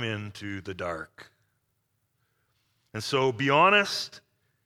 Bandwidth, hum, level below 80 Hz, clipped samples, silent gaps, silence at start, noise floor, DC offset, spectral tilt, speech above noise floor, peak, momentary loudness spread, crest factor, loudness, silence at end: 16 kHz; none; -68 dBFS; under 0.1%; none; 0 s; -76 dBFS; under 0.1%; -4.5 dB/octave; 49 dB; -8 dBFS; 19 LU; 22 dB; -25 LUFS; 0.45 s